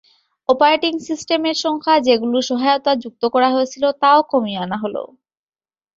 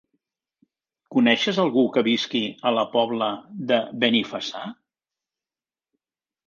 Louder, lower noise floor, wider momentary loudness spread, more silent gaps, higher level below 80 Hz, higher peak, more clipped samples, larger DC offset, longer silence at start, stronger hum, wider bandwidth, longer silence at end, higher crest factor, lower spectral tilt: first, -17 LUFS vs -22 LUFS; about the same, under -90 dBFS vs under -90 dBFS; about the same, 10 LU vs 11 LU; neither; first, -64 dBFS vs -72 dBFS; about the same, -2 dBFS vs -4 dBFS; neither; neither; second, 0.5 s vs 1.1 s; neither; about the same, 7.8 kHz vs 7.2 kHz; second, 0.9 s vs 1.75 s; about the same, 16 dB vs 20 dB; about the same, -4 dB/octave vs -5 dB/octave